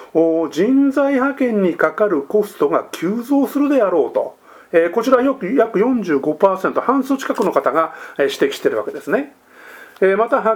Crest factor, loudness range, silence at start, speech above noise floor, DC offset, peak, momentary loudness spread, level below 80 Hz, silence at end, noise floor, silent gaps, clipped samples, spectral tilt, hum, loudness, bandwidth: 16 dB; 2 LU; 0 s; 24 dB; under 0.1%; 0 dBFS; 6 LU; -66 dBFS; 0 s; -40 dBFS; none; under 0.1%; -6 dB/octave; none; -17 LUFS; 18 kHz